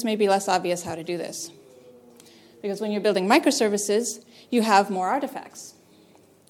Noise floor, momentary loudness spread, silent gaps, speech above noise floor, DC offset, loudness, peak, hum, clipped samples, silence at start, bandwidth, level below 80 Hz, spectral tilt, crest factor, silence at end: -55 dBFS; 18 LU; none; 32 dB; under 0.1%; -23 LUFS; -2 dBFS; none; under 0.1%; 0 s; 17 kHz; -72 dBFS; -3.5 dB/octave; 22 dB; 0.8 s